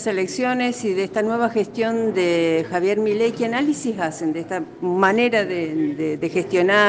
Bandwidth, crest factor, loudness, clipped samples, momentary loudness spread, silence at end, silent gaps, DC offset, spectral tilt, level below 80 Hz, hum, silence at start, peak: 9.6 kHz; 16 dB; -21 LUFS; under 0.1%; 6 LU; 0 s; none; under 0.1%; -5 dB/octave; -64 dBFS; none; 0 s; -4 dBFS